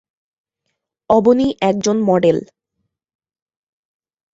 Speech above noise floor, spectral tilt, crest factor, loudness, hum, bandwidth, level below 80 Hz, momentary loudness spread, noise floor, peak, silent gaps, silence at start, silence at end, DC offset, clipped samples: 61 dB; -6 dB/octave; 18 dB; -15 LUFS; none; 7.8 kHz; -54 dBFS; 4 LU; -75 dBFS; -2 dBFS; none; 1.1 s; 1.9 s; under 0.1%; under 0.1%